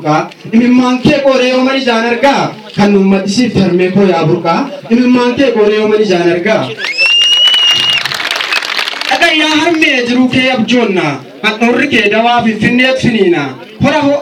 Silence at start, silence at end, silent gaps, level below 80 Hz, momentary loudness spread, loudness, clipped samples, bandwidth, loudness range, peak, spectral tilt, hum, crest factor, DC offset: 0 s; 0 s; none; -46 dBFS; 7 LU; -9 LUFS; 0.2%; 15 kHz; 2 LU; 0 dBFS; -4.5 dB/octave; none; 10 dB; under 0.1%